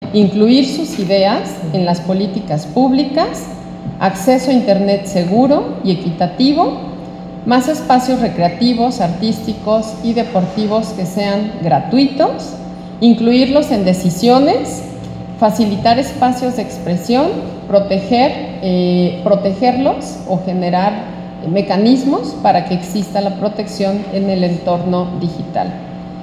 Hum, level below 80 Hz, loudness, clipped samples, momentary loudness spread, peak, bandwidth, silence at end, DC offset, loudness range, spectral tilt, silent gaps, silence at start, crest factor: none; -44 dBFS; -15 LUFS; under 0.1%; 10 LU; 0 dBFS; 14.5 kHz; 0 s; under 0.1%; 3 LU; -6.5 dB/octave; none; 0 s; 14 dB